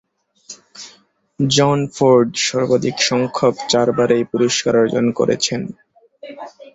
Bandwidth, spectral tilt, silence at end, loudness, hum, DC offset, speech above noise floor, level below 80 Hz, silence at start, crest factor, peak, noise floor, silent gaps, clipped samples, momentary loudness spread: 8 kHz; -4.5 dB/octave; 0.05 s; -16 LUFS; none; under 0.1%; 37 dB; -56 dBFS; 0.5 s; 16 dB; -2 dBFS; -53 dBFS; none; under 0.1%; 22 LU